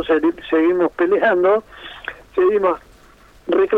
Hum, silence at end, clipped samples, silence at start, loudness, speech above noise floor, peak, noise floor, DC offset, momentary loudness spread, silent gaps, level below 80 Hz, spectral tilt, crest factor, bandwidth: none; 0 s; under 0.1%; 0 s; -18 LUFS; 31 dB; -4 dBFS; -48 dBFS; under 0.1%; 16 LU; none; -52 dBFS; -6.5 dB/octave; 12 dB; 5 kHz